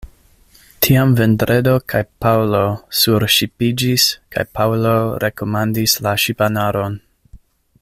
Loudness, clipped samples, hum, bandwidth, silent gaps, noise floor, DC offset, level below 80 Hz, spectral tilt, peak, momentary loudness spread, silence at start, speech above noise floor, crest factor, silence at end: -16 LUFS; under 0.1%; none; 16 kHz; none; -50 dBFS; under 0.1%; -44 dBFS; -4.5 dB/octave; 0 dBFS; 7 LU; 0.05 s; 34 dB; 16 dB; 0.45 s